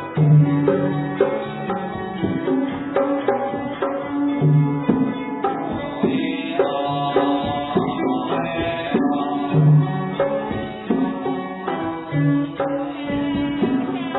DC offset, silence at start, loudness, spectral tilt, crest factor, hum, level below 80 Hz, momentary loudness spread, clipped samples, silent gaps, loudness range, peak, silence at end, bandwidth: under 0.1%; 0 s; -21 LUFS; -11.5 dB/octave; 18 dB; none; -50 dBFS; 9 LU; under 0.1%; none; 3 LU; -2 dBFS; 0 s; 4.1 kHz